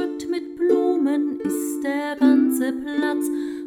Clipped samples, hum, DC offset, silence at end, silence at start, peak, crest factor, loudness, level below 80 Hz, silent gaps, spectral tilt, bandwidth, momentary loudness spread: under 0.1%; none; under 0.1%; 0 s; 0 s; -6 dBFS; 14 dB; -22 LUFS; -64 dBFS; none; -4 dB/octave; 18 kHz; 8 LU